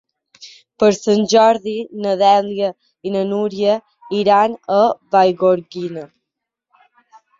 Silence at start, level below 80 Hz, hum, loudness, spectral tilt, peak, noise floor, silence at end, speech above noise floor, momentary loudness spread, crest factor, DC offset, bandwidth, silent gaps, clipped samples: 0.4 s; -62 dBFS; none; -16 LUFS; -5 dB/octave; -2 dBFS; -80 dBFS; 1.35 s; 65 dB; 12 LU; 16 dB; under 0.1%; 7.8 kHz; none; under 0.1%